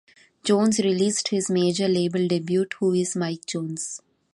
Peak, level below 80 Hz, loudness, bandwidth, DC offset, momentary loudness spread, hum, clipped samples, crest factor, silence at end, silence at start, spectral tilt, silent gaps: -8 dBFS; -68 dBFS; -23 LUFS; 11.5 kHz; under 0.1%; 9 LU; none; under 0.1%; 16 dB; 0.4 s; 0.45 s; -5 dB/octave; none